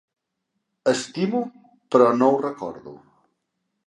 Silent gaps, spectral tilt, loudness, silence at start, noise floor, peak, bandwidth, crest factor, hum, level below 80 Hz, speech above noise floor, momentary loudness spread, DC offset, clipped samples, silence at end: none; -5.5 dB/octave; -21 LUFS; 0.85 s; -78 dBFS; -2 dBFS; 11.5 kHz; 22 dB; none; -72 dBFS; 57 dB; 17 LU; under 0.1%; under 0.1%; 0.9 s